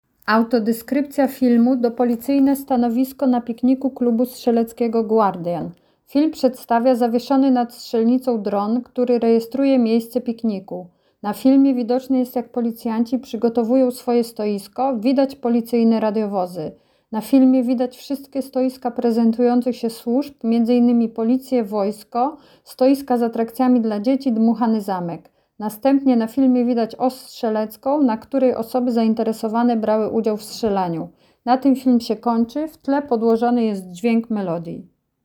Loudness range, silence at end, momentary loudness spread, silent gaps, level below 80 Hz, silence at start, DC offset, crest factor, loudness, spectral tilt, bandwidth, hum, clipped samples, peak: 2 LU; 0.4 s; 9 LU; none; -62 dBFS; 0.25 s; under 0.1%; 16 dB; -19 LUFS; -6.5 dB/octave; 18.5 kHz; none; under 0.1%; -4 dBFS